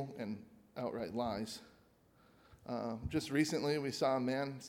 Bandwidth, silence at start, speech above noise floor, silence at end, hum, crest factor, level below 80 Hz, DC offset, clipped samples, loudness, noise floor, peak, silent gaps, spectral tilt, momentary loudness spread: 16.5 kHz; 0 s; 30 dB; 0 s; none; 20 dB; -62 dBFS; under 0.1%; under 0.1%; -38 LUFS; -68 dBFS; -20 dBFS; none; -5.5 dB/octave; 13 LU